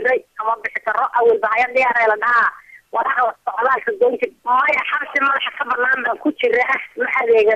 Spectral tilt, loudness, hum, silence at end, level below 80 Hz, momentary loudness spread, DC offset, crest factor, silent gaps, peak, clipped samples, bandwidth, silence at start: -4 dB/octave; -17 LUFS; none; 0 s; -62 dBFS; 6 LU; under 0.1%; 12 dB; none; -6 dBFS; under 0.1%; 8 kHz; 0 s